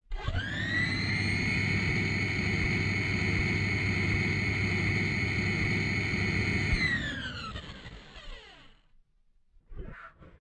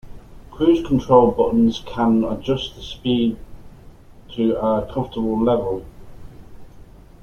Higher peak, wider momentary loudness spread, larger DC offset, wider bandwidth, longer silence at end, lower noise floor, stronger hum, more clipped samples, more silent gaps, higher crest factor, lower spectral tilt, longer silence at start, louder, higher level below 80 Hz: second, -16 dBFS vs -2 dBFS; first, 19 LU vs 12 LU; neither; first, 9.4 kHz vs 7 kHz; second, 0.25 s vs 0.4 s; first, -65 dBFS vs -43 dBFS; neither; neither; neither; second, 14 dB vs 20 dB; second, -5.5 dB/octave vs -7.5 dB/octave; about the same, 0.1 s vs 0.05 s; second, -29 LUFS vs -19 LUFS; about the same, -42 dBFS vs -40 dBFS